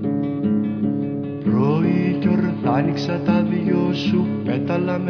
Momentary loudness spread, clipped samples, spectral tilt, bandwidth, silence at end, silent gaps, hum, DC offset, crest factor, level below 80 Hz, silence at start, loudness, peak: 4 LU; under 0.1%; -8.5 dB/octave; 5.4 kHz; 0 s; none; none; under 0.1%; 14 dB; -56 dBFS; 0 s; -20 LUFS; -6 dBFS